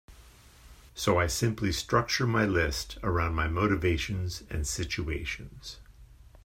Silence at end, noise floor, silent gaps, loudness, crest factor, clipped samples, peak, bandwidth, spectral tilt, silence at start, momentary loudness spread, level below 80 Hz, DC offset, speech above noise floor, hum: 0.05 s; -54 dBFS; none; -29 LUFS; 20 dB; under 0.1%; -10 dBFS; 16 kHz; -4.5 dB/octave; 0.1 s; 13 LU; -42 dBFS; under 0.1%; 25 dB; none